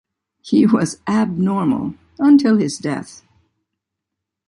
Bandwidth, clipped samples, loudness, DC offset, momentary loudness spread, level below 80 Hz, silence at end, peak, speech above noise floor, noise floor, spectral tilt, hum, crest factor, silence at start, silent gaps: 11.5 kHz; under 0.1%; -17 LUFS; under 0.1%; 12 LU; -56 dBFS; 1.35 s; -2 dBFS; 65 dB; -81 dBFS; -6.5 dB/octave; none; 16 dB; 0.45 s; none